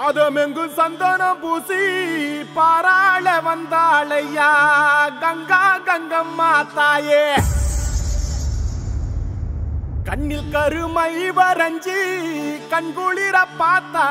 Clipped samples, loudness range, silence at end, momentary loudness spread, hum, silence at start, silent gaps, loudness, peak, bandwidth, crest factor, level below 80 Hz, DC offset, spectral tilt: under 0.1%; 7 LU; 0 s; 11 LU; none; 0 s; none; -18 LUFS; -2 dBFS; 16 kHz; 16 dB; -30 dBFS; under 0.1%; -4.5 dB/octave